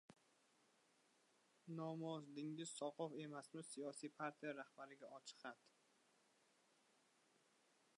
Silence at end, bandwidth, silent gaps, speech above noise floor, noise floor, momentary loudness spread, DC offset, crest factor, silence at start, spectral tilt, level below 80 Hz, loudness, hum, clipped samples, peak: 2.3 s; 11 kHz; none; 27 dB; -79 dBFS; 10 LU; under 0.1%; 20 dB; 0.1 s; -4.5 dB/octave; under -90 dBFS; -52 LUFS; none; under 0.1%; -34 dBFS